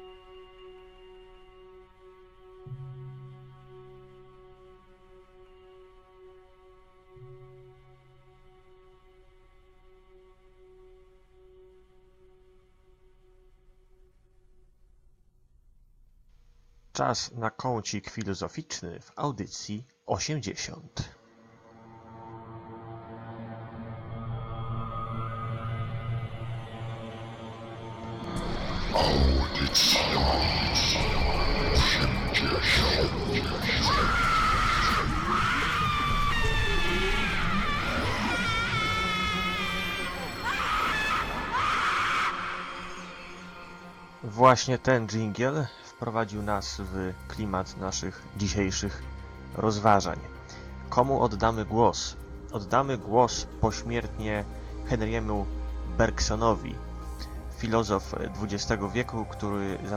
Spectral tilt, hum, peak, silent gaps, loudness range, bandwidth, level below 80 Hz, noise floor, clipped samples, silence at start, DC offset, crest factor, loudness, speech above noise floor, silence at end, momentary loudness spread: -4 dB/octave; none; -6 dBFS; none; 15 LU; 17.5 kHz; -38 dBFS; -61 dBFS; under 0.1%; 0 s; under 0.1%; 24 dB; -28 LUFS; 33 dB; 0 s; 18 LU